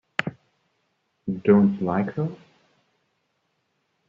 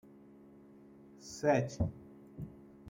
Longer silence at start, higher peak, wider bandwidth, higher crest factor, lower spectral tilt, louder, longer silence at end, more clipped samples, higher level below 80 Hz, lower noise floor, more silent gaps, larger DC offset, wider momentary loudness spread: second, 0.2 s vs 1.2 s; first, -4 dBFS vs -16 dBFS; second, 7 kHz vs 16 kHz; about the same, 24 dB vs 22 dB; about the same, -7 dB/octave vs -6.5 dB/octave; first, -23 LUFS vs -34 LUFS; first, 1.75 s vs 0 s; neither; second, -64 dBFS vs -58 dBFS; first, -73 dBFS vs -58 dBFS; neither; neither; second, 16 LU vs 27 LU